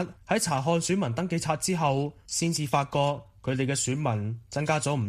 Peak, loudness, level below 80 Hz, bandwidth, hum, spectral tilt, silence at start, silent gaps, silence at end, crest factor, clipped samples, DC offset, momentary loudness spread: -10 dBFS; -28 LUFS; -58 dBFS; 15 kHz; none; -4.5 dB/octave; 0 s; none; 0 s; 18 dB; under 0.1%; under 0.1%; 5 LU